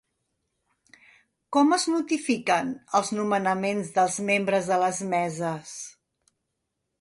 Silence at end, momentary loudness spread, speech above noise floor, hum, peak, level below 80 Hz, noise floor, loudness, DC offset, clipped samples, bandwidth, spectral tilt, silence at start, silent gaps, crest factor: 1.1 s; 9 LU; 56 dB; none; -8 dBFS; -72 dBFS; -80 dBFS; -25 LUFS; under 0.1%; under 0.1%; 11.5 kHz; -4 dB/octave; 1.5 s; none; 18 dB